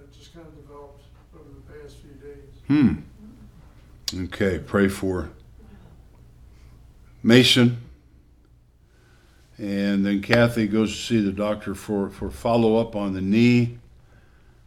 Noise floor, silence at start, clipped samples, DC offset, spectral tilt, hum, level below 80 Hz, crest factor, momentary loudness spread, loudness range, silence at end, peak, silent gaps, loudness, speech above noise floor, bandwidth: -55 dBFS; 0.35 s; under 0.1%; under 0.1%; -5.5 dB/octave; none; -48 dBFS; 22 dB; 18 LU; 6 LU; 0.85 s; -2 dBFS; none; -21 LUFS; 33 dB; 15 kHz